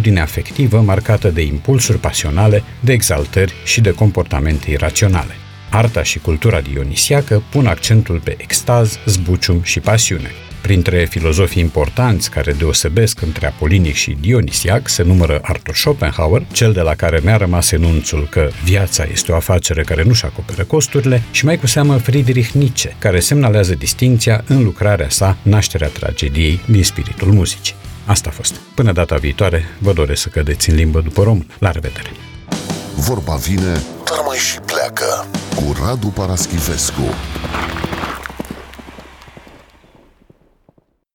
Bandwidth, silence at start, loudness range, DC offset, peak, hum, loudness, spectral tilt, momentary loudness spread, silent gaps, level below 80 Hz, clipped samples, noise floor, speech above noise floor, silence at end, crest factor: 18.5 kHz; 0 s; 5 LU; under 0.1%; -2 dBFS; none; -14 LUFS; -4.5 dB/octave; 8 LU; none; -24 dBFS; under 0.1%; -55 dBFS; 41 dB; 2.1 s; 12 dB